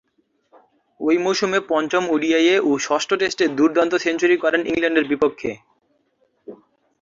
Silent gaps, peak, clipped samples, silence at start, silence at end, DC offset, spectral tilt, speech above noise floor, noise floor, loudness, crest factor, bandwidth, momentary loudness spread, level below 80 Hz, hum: none; -4 dBFS; under 0.1%; 1 s; 0.45 s; under 0.1%; -3.5 dB/octave; 47 dB; -66 dBFS; -19 LUFS; 16 dB; 7.6 kHz; 4 LU; -60 dBFS; none